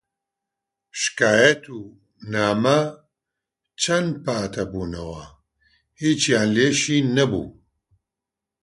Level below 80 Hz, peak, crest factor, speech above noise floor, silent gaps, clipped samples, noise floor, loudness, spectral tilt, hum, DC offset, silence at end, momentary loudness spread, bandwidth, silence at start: -52 dBFS; -2 dBFS; 22 dB; 66 dB; none; under 0.1%; -86 dBFS; -21 LUFS; -4 dB/octave; none; under 0.1%; 1.1 s; 17 LU; 11.5 kHz; 0.95 s